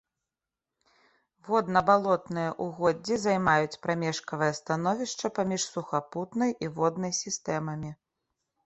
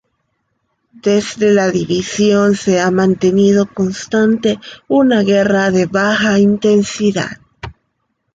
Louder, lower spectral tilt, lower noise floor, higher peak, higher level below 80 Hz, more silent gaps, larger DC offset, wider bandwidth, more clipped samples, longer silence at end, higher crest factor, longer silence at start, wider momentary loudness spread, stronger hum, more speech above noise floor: second, -28 LUFS vs -13 LUFS; about the same, -4.5 dB/octave vs -5.5 dB/octave; first, -89 dBFS vs -68 dBFS; second, -8 dBFS vs -2 dBFS; second, -64 dBFS vs -48 dBFS; neither; neither; about the same, 8.4 kHz vs 9 kHz; neither; about the same, 0.7 s vs 0.65 s; first, 22 dB vs 12 dB; first, 1.45 s vs 1.05 s; about the same, 8 LU vs 9 LU; neither; first, 61 dB vs 55 dB